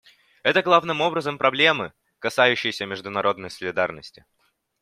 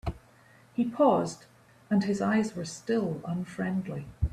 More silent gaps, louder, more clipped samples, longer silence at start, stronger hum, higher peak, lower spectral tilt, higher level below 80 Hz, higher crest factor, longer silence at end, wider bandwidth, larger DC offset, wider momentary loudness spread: neither; first, -22 LUFS vs -29 LUFS; neither; first, 0.45 s vs 0.05 s; neither; first, -2 dBFS vs -10 dBFS; second, -4 dB/octave vs -6.5 dB/octave; second, -66 dBFS vs -46 dBFS; about the same, 22 dB vs 18 dB; first, 0.75 s vs 0 s; first, 15 kHz vs 12.5 kHz; neither; about the same, 12 LU vs 14 LU